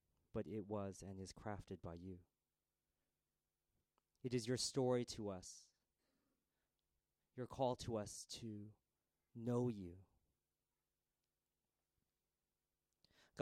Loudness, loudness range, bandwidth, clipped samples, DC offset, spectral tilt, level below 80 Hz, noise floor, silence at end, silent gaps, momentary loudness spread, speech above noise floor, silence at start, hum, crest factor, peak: -46 LUFS; 8 LU; 15.5 kHz; under 0.1%; under 0.1%; -5 dB/octave; -74 dBFS; under -90 dBFS; 0 s; none; 18 LU; over 44 dB; 0.35 s; none; 22 dB; -26 dBFS